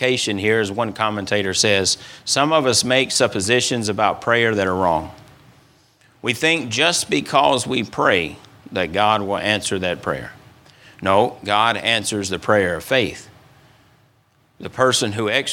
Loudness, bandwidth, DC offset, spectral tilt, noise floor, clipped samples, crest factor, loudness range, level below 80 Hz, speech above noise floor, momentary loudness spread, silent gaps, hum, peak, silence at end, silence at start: -18 LUFS; 18 kHz; under 0.1%; -3 dB/octave; -59 dBFS; under 0.1%; 20 dB; 4 LU; -54 dBFS; 40 dB; 9 LU; none; none; 0 dBFS; 0 s; 0 s